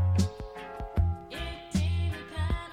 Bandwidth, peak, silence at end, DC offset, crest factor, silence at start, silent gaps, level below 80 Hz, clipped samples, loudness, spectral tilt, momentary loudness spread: 11 kHz; -14 dBFS; 0 s; under 0.1%; 16 dB; 0 s; none; -38 dBFS; under 0.1%; -32 LUFS; -6.5 dB/octave; 11 LU